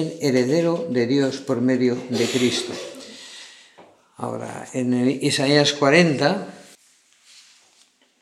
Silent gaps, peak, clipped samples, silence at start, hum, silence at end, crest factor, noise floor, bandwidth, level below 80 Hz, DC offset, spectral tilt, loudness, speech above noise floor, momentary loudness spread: none; 0 dBFS; under 0.1%; 0 s; none; 1.6 s; 22 dB; -59 dBFS; 13.5 kHz; -74 dBFS; under 0.1%; -5 dB/octave; -20 LUFS; 38 dB; 20 LU